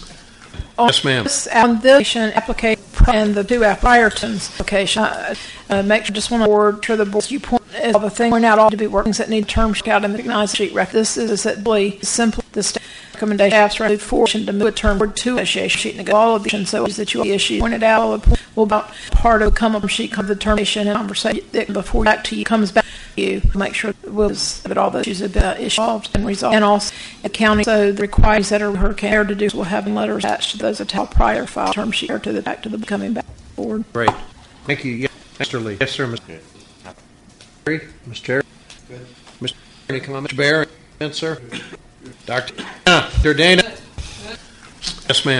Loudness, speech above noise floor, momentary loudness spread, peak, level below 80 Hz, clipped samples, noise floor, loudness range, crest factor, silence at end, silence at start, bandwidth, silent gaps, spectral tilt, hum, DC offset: -17 LUFS; 29 dB; 13 LU; 0 dBFS; -26 dBFS; under 0.1%; -46 dBFS; 7 LU; 18 dB; 0 s; 0 s; 11.5 kHz; none; -4 dB/octave; none; under 0.1%